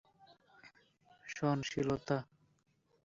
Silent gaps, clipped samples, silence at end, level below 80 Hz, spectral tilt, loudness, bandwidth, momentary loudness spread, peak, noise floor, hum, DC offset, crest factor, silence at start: none; under 0.1%; 0.8 s; -68 dBFS; -5.5 dB/octave; -37 LUFS; 7.6 kHz; 18 LU; -20 dBFS; -68 dBFS; none; under 0.1%; 22 dB; 0.65 s